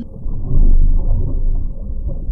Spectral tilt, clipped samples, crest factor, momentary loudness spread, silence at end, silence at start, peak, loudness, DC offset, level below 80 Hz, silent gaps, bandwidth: -13.5 dB/octave; under 0.1%; 10 dB; 11 LU; 0 s; 0 s; -2 dBFS; -22 LUFS; under 0.1%; -12 dBFS; none; 1.1 kHz